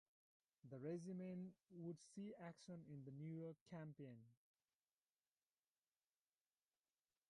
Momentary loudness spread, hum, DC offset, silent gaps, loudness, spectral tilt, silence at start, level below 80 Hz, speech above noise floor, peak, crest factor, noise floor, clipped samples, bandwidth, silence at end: 8 LU; none; under 0.1%; 3.61-3.66 s; -56 LUFS; -7.5 dB/octave; 0.65 s; under -90 dBFS; over 35 dB; -40 dBFS; 18 dB; under -90 dBFS; under 0.1%; 11 kHz; 2.95 s